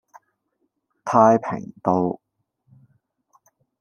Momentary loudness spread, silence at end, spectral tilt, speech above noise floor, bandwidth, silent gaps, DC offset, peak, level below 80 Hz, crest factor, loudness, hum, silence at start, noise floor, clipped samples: 18 LU; 1.65 s; -8 dB/octave; 54 dB; 8.8 kHz; none; under 0.1%; -2 dBFS; -68 dBFS; 22 dB; -20 LUFS; none; 1.05 s; -73 dBFS; under 0.1%